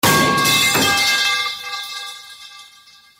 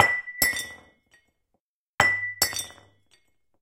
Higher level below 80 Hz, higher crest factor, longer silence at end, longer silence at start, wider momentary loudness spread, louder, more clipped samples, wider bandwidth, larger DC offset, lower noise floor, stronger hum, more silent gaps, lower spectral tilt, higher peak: first, -52 dBFS vs -58 dBFS; second, 16 dB vs 28 dB; second, 0.55 s vs 0.9 s; about the same, 0.05 s vs 0 s; first, 20 LU vs 13 LU; first, -15 LUFS vs -24 LUFS; neither; about the same, 16.5 kHz vs 16.5 kHz; neither; second, -48 dBFS vs -78 dBFS; neither; second, none vs 1.60-1.98 s; first, -2 dB/octave vs -0.5 dB/octave; about the same, -2 dBFS vs 0 dBFS